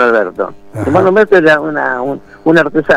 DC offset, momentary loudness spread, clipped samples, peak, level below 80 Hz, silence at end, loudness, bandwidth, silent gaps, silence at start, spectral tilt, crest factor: under 0.1%; 13 LU; under 0.1%; 0 dBFS; -46 dBFS; 0 s; -11 LUFS; 11.5 kHz; none; 0 s; -7 dB/octave; 10 dB